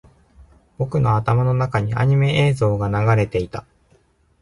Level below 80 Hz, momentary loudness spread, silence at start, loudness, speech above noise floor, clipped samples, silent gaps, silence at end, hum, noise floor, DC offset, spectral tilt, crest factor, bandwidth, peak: -42 dBFS; 9 LU; 0.8 s; -19 LUFS; 40 dB; under 0.1%; none; 0.8 s; none; -58 dBFS; under 0.1%; -7.5 dB/octave; 16 dB; 11.5 kHz; -4 dBFS